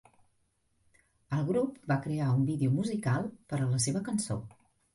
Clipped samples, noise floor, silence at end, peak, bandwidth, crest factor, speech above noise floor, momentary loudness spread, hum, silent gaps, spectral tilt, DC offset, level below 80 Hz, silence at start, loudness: under 0.1%; -74 dBFS; 0.45 s; -18 dBFS; 11.5 kHz; 16 dB; 44 dB; 7 LU; none; none; -6 dB/octave; under 0.1%; -62 dBFS; 1.3 s; -31 LUFS